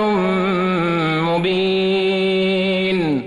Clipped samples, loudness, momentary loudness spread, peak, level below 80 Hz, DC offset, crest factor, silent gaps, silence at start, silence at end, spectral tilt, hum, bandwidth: under 0.1%; -18 LUFS; 1 LU; -8 dBFS; -50 dBFS; under 0.1%; 8 dB; none; 0 s; 0 s; -7 dB/octave; none; 11 kHz